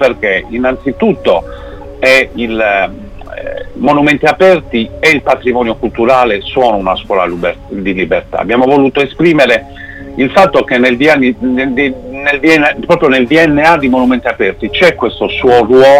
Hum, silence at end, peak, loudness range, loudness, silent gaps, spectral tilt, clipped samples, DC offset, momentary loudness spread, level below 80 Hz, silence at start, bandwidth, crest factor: none; 0 s; 0 dBFS; 3 LU; -10 LUFS; none; -5.5 dB/octave; 0.2%; under 0.1%; 9 LU; -34 dBFS; 0 s; 16 kHz; 10 dB